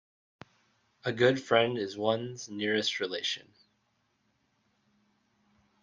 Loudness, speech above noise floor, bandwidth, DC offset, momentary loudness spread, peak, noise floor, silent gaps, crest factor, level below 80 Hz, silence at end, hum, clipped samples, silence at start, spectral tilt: -30 LUFS; 45 dB; 9.8 kHz; under 0.1%; 11 LU; -10 dBFS; -75 dBFS; none; 24 dB; -76 dBFS; 2.4 s; none; under 0.1%; 1.05 s; -4.5 dB/octave